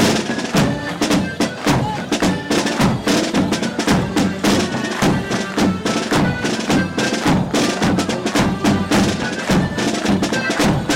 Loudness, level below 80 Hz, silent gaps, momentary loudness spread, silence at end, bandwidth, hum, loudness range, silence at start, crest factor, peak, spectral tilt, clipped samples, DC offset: -18 LUFS; -38 dBFS; none; 3 LU; 0 s; 16.5 kHz; none; 1 LU; 0 s; 14 dB; -4 dBFS; -4.5 dB/octave; under 0.1%; under 0.1%